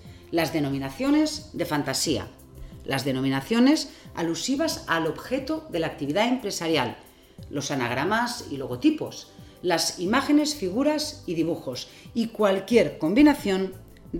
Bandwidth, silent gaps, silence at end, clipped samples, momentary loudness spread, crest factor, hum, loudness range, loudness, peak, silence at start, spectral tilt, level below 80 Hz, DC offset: 17 kHz; none; 0 s; under 0.1%; 12 LU; 18 dB; none; 3 LU; -25 LUFS; -6 dBFS; 0.05 s; -4.5 dB/octave; -52 dBFS; under 0.1%